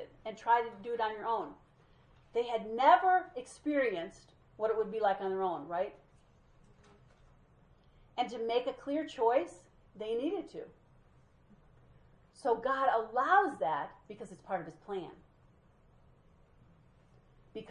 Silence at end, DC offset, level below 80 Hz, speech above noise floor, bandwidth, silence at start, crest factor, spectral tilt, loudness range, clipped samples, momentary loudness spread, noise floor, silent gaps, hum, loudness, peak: 0 s; under 0.1%; -68 dBFS; 32 dB; 10.5 kHz; 0 s; 24 dB; -5 dB/octave; 10 LU; under 0.1%; 17 LU; -64 dBFS; none; none; -33 LUFS; -12 dBFS